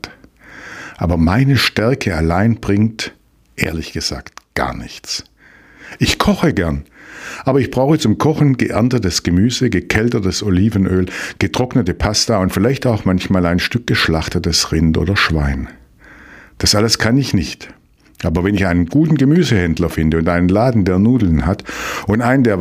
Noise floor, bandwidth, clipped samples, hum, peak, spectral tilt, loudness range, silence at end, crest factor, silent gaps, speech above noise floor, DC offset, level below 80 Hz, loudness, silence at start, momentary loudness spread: -45 dBFS; 16 kHz; under 0.1%; none; 0 dBFS; -5.5 dB/octave; 5 LU; 0 s; 16 dB; none; 30 dB; under 0.1%; -32 dBFS; -15 LUFS; 0.05 s; 11 LU